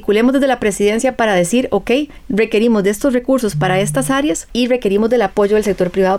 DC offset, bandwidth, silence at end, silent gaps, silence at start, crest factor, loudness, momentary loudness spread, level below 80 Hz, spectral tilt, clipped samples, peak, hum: under 0.1%; 16 kHz; 0 s; none; 0 s; 10 dB; -15 LUFS; 4 LU; -40 dBFS; -5 dB/octave; under 0.1%; -4 dBFS; none